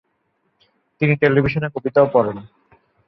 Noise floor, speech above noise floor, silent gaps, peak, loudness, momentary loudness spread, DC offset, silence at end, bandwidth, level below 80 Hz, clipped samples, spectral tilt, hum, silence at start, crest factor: -68 dBFS; 51 dB; none; -2 dBFS; -18 LUFS; 9 LU; under 0.1%; 0.6 s; 5.8 kHz; -50 dBFS; under 0.1%; -10 dB/octave; none; 1 s; 18 dB